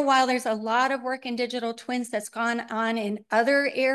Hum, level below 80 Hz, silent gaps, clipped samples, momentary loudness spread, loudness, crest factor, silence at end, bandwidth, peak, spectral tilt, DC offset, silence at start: none; -78 dBFS; none; under 0.1%; 8 LU; -26 LUFS; 16 dB; 0 s; 12.5 kHz; -8 dBFS; -3.5 dB/octave; under 0.1%; 0 s